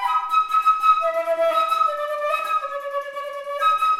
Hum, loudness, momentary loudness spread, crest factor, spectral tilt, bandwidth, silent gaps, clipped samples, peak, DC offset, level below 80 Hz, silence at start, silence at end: none; -21 LUFS; 11 LU; 14 dB; 0 dB/octave; 16 kHz; none; under 0.1%; -6 dBFS; under 0.1%; -68 dBFS; 0 s; 0 s